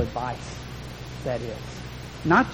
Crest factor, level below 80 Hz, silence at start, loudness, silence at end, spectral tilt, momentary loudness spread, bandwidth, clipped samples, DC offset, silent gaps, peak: 22 dB; -44 dBFS; 0 s; -30 LUFS; 0 s; -6 dB/octave; 16 LU; 18 kHz; under 0.1%; under 0.1%; none; -6 dBFS